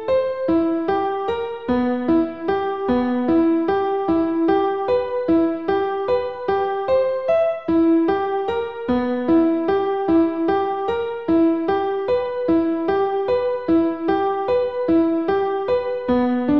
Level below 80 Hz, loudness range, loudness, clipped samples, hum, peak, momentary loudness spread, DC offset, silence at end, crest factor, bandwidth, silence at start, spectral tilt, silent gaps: -50 dBFS; 1 LU; -20 LUFS; under 0.1%; none; -8 dBFS; 5 LU; 0.4%; 0 s; 12 dB; 5.6 kHz; 0 s; -8.5 dB/octave; none